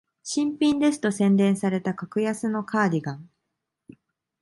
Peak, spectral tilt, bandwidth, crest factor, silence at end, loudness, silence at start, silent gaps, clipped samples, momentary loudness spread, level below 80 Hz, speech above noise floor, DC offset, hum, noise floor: -10 dBFS; -6 dB/octave; 11.5 kHz; 16 dB; 1.15 s; -24 LUFS; 0.25 s; none; under 0.1%; 9 LU; -68 dBFS; 58 dB; under 0.1%; none; -81 dBFS